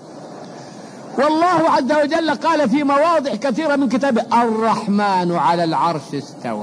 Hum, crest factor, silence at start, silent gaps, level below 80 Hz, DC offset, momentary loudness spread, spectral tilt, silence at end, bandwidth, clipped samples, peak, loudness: none; 12 dB; 0 s; none; -64 dBFS; under 0.1%; 20 LU; -5.5 dB/octave; 0 s; 10.5 kHz; under 0.1%; -6 dBFS; -17 LUFS